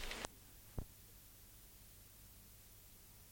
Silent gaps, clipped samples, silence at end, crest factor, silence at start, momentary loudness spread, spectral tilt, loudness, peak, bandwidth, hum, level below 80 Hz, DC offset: none; under 0.1%; 0 s; 30 dB; 0 s; 10 LU; -3 dB/octave; -56 LUFS; -24 dBFS; 17 kHz; 50 Hz at -65 dBFS; -58 dBFS; under 0.1%